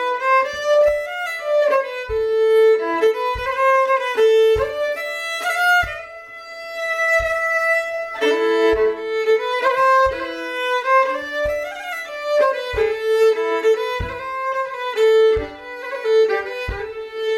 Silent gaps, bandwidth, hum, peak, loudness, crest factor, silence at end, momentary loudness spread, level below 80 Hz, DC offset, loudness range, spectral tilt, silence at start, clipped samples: none; 16 kHz; none; -6 dBFS; -18 LUFS; 14 dB; 0 s; 11 LU; -42 dBFS; under 0.1%; 3 LU; -3.5 dB/octave; 0 s; under 0.1%